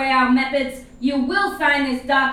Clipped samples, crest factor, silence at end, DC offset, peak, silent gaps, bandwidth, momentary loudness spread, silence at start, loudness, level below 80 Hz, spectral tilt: under 0.1%; 14 dB; 0 s; under 0.1%; -4 dBFS; none; 14.5 kHz; 8 LU; 0 s; -19 LUFS; -46 dBFS; -4 dB/octave